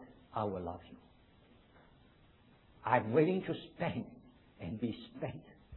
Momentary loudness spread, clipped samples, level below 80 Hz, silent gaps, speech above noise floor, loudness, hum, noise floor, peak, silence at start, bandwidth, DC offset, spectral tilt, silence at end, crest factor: 19 LU; under 0.1%; -66 dBFS; none; 28 dB; -37 LUFS; none; -64 dBFS; -16 dBFS; 0 s; 4 kHz; under 0.1%; -6 dB/octave; 0 s; 22 dB